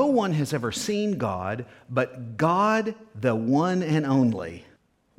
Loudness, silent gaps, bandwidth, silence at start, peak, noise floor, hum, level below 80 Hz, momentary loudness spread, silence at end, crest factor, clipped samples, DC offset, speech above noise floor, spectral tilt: -25 LUFS; none; 15.5 kHz; 0 s; -8 dBFS; -61 dBFS; none; -62 dBFS; 11 LU; 0.6 s; 18 dB; under 0.1%; under 0.1%; 36 dB; -6 dB/octave